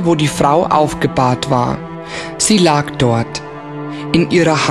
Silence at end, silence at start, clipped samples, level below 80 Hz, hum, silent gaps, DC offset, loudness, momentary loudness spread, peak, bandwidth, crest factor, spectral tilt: 0 s; 0 s; under 0.1%; -42 dBFS; none; none; 0.3%; -14 LUFS; 14 LU; 0 dBFS; 13.5 kHz; 14 dB; -5 dB/octave